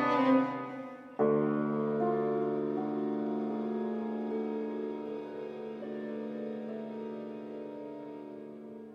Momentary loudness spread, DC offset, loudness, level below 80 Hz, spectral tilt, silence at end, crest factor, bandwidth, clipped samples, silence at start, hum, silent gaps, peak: 15 LU; under 0.1%; -34 LUFS; -78 dBFS; -8.5 dB/octave; 0 s; 18 dB; 6.6 kHz; under 0.1%; 0 s; none; none; -16 dBFS